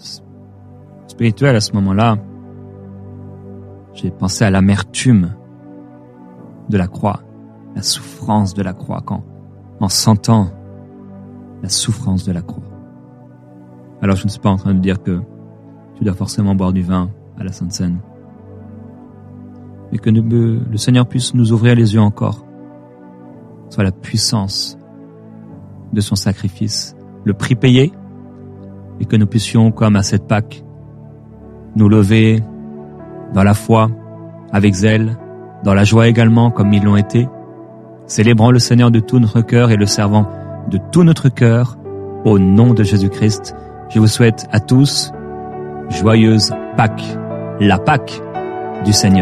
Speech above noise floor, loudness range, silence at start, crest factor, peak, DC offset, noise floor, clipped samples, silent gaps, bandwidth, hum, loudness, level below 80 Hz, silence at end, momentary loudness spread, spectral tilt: 27 dB; 8 LU; 0.05 s; 14 dB; 0 dBFS; under 0.1%; -39 dBFS; under 0.1%; none; 13 kHz; none; -14 LUFS; -44 dBFS; 0 s; 23 LU; -6 dB/octave